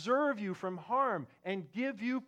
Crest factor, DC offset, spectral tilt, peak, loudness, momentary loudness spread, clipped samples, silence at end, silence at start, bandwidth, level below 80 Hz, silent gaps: 14 dB; under 0.1%; -6.5 dB/octave; -20 dBFS; -35 LUFS; 9 LU; under 0.1%; 0 s; 0 s; 9.4 kHz; -86 dBFS; none